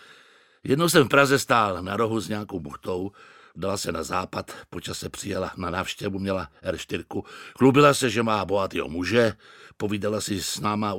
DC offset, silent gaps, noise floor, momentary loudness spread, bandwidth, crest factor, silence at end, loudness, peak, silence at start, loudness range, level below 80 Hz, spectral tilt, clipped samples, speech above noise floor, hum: under 0.1%; none; -56 dBFS; 15 LU; 17 kHz; 22 dB; 0 s; -24 LUFS; -2 dBFS; 0.65 s; 8 LU; -56 dBFS; -4.5 dB/octave; under 0.1%; 31 dB; none